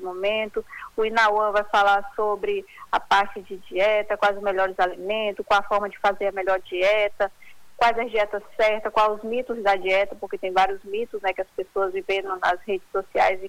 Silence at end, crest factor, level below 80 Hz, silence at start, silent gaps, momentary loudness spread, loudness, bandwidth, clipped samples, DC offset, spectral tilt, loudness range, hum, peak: 0 s; 14 dB; -54 dBFS; 0 s; none; 8 LU; -23 LUFS; 18 kHz; under 0.1%; under 0.1%; -3.5 dB/octave; 2 LU; none; -8 dBFS